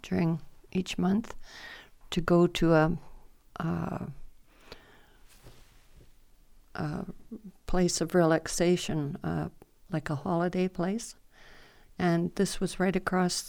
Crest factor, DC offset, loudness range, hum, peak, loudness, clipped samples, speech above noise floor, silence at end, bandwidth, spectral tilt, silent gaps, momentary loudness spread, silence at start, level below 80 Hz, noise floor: 20 dB; under 0.1%; 13 LU; none; -10 dBFS; -29 LUFS; under 0.1%; 28 dB; 0 s; 17.5 kHz; -5.5 dB/octave; none; 20 LU; 0.05 s; -46 dBFS; -56 dBFS